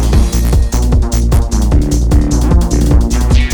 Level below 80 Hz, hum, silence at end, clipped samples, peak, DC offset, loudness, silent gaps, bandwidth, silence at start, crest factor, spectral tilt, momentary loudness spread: -10 dBFS; none; 0 s; under 0.1%; 0 dBFS; under 0.1%; -12 LUFS; none; 18 kHz; 0 s; 8 dB; -6 dB/octave; 1 LU